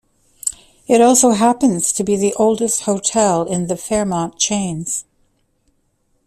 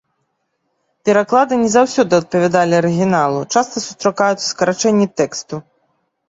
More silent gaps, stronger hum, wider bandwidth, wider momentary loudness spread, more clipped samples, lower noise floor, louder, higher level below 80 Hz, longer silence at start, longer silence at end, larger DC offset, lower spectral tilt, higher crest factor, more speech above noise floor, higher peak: neither; neither; first, 15 kHz vs 8 kHz; first, 13 LU vs 7 LU; neither; second, -63 dBFS vs -69 dBFS; about the same, -16 LUFS vs -15 LUFS; first, -52 dBFS vs -58 dBFS; second, 0.45 s vs 1.05 s; first, 1.25 s vs 0.7 s; neither; about the same, -4 dB/octave vs -4.5 dB/octave; about the same, 16 dB vs 14 dB; second, 48 dB vs 54 dB; about the same, 0 dBFS vs -2 dBFS